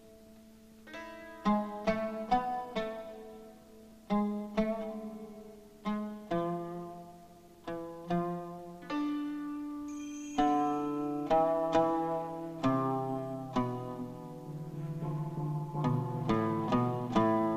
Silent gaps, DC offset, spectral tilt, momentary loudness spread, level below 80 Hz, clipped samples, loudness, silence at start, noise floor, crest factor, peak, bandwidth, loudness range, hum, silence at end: none; under 0.1%; -7.5 dB/octave; 17 LU; -58 dBFS; under 0.1%; -34 LUFS; 0 s; -56 dBFS; 20 dB; -14 dBFS; 15 kHz; 7 LU; none; 0 s